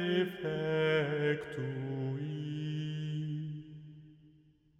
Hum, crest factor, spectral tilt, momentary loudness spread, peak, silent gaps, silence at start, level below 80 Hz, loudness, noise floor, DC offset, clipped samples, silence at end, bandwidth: none; 16 dB; -7.5 dB/octave; 14 LU; -20 dBFS; none; 0 s; -70 dBFS; -35 LUFS; -65 dBFS; under 0.1%; under 0.1%; 0.5 s; 8.2 kHz